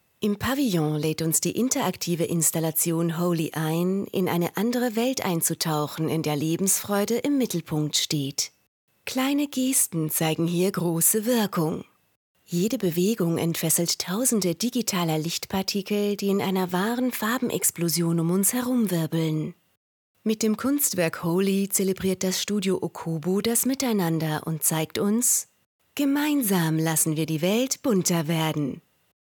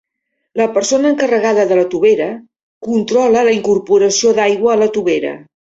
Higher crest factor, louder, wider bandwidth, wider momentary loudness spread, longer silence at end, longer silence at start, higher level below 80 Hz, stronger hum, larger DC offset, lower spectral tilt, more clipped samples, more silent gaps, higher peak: first, 18 dB vs 12 dB; second, -24 LUFS vs -13 LUFS; first, 19 kHz vs 8 kHz; second, 5 LU vs 11 LU; first, 0.5 s vs 0.35 s; second, 0.2 s vs 0.55 s; about the same, -62 dBFS vs -58 dBFS; neither; neither; about the same, -4 dB/octave vs -3.5 dB/octave; neither; first, 8.68-8.88 s, 12.16-12.35 s, 19.77-20.15 s, 25.66-25.79 s vs 2.63-2.81 s; second, -8 dBFS vs -2 dBFS